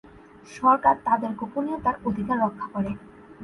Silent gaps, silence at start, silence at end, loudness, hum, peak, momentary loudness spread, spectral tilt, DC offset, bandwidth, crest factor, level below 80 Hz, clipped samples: none; 0.45 s; 0 s; -24 LUFS; none; -6 dBFS; 11 LU; -7.5 dB/octave; under 0.1%; 11.5 kHz; 18 dB; -54 dBFS; under 0.1%